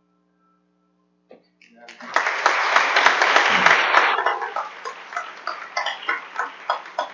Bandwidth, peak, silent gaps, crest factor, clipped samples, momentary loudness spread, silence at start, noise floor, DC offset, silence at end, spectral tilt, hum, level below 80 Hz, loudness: 7.6 kHz; 0 dBFS; none; 22 dB; under 0.1%; 17 LU; 1.9 s; -65 dBFS; under 0.1%; 0 s; -1 dB/octave; 60 Hz at -65 dBFS; -74 dBFS; -19 LUFS